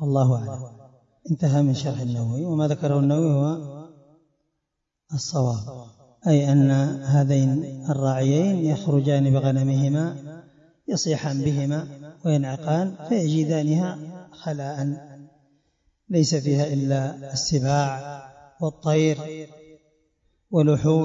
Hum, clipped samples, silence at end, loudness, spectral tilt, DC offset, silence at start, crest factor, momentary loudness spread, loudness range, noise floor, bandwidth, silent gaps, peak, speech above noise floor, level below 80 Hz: none; under 0.1%; 0 s; -23 LUFS; -7 dB/octave; under 0.1%; 0 s; 14 dB; 16 LU; 5 LU; -80 dBFS; 7.8 kHz; none; -8 dBFS; 59 dB; -60 dBFS